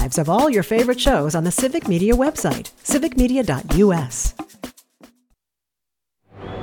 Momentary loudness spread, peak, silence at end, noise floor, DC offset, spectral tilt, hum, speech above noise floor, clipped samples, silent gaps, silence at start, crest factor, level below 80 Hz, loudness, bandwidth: 18 LU; -2 dBFS; 0 s; -85 dBFS; under 0.1%; -5 dB/octave; none; 67 dB; under 0.1%; none; 0 s; 18 dB; -32 dBFS; -19 LUFS; 19.5 kHz